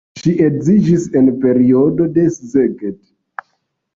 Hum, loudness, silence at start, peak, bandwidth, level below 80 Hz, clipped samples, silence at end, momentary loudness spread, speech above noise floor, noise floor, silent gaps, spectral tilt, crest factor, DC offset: none; -13 LUFS; 0.15 s; -2 dBFS; 7.6 kHz; -48 dBFS; under 0.1%; 1 s; 20 LU; 55 dB; -67 dBFS; none; -8.5 dB/octave; 12 dB; under 0.1%